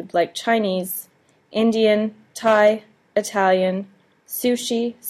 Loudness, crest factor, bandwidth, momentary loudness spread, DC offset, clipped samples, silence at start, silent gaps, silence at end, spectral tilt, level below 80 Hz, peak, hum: -21 LUFS; 18 dB; 15.5 kHz; 12 LU; under 0.1%; under 0.1%; 0 s; none; 0 s; -4.5 dB/octave; -68 dBFS; -4 dBFS; none